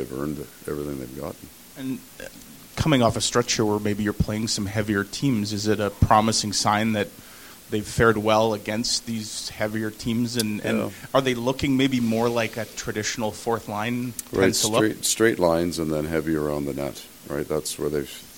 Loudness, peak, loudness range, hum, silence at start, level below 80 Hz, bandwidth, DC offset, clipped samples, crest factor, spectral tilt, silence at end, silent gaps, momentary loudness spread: -24 LUFS; -2 dBFS; 3 LU; none; 0 s; -44 dBFS; 17 kHz; 0.1%; under 0.1%; 22 dB; -4.5 dB/octave; 0 s; none; 13 LU